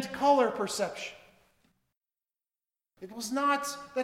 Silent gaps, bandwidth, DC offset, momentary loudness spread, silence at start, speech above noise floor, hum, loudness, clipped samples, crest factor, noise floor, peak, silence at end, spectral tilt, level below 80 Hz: 1.97-2.01 s; 16.5 kHz; under 0.1%; 17 LU; 0 s; over 60 dB; none; -29 LUFS; under 0.1%; 18 dB; under -90 dBFS; -14 dBFS; 0 s; -3 dB/octave; -72 dBFS